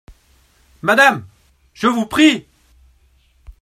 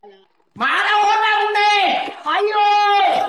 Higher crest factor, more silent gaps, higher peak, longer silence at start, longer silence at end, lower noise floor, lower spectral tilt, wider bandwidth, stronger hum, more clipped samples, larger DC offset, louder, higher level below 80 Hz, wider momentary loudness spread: first, 18 dB vs 8 dB; neither; first, 0 dBFS vs -8 dBFS; first, 0.85 s vs 0.05 s; about the same, 0.1 s vs 0 s; first, -55 dBFS vs -49 dBFS; first, -4 dB/octave vs -1 dB/octave; first, 15 kHz vs 12.5 kHz; neither; neither; neither; about the same, -15 LUFS vs -16 LUFS; first, -50 dBFS vs -66 dBFS; first, 12 LU vs 6 LU